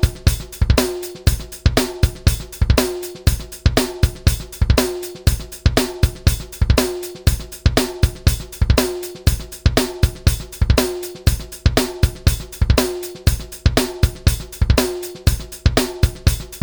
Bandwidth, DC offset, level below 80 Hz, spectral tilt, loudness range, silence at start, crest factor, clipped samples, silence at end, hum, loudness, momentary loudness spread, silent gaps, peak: over 20 kHz; under 0.1%; -22 dBFS; -5 dB/octave; 0 LU; 0 s; 16 dB; under 0.1%; 0 s; none; -19 LUFS; 4 LU; none; 0 dBFS